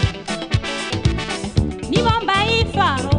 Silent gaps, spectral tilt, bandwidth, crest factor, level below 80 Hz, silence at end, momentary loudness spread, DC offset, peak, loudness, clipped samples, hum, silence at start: none; -5 dB/octave; 10.5 kHz; 16 dB; -30 dBFS; 0 s; 6 LU; under 0.1%; -4 dBFS; -19 LUFS; under 0.1%; none; 0 s